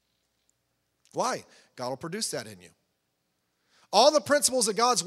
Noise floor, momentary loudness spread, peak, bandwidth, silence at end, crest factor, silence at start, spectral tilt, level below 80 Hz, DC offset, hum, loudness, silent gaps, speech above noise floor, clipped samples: -77 dBFS; 17 LU; -6 dBFS; 16 kHz; 0 s; 22 dB; 1.15 s; -2 dB/octave; -76 dBFS; under 0.1%; none; -25 LUFS; none; 51 dB; under 0.1%